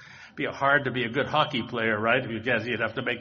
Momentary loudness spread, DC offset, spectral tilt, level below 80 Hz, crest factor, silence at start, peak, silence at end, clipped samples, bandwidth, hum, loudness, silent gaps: 6 LU; under 0.1%; -2.5 dB/octave; -62 dBFS; 20 dB; 0 s; -8 dBFS; 0 s; under 0.1%; 7 kHz; none; -26 LUFS; none